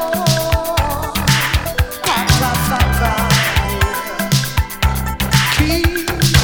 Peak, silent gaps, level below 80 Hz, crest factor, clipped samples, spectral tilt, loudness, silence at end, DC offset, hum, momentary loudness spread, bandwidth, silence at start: 0 dBFS; none; -22 dBFS; 16 dB; under 0.1%; -4 dB/octave; -16 LUFS; 0 s; under 0.1%; none; 5 LU; over 20 kHz; 0 s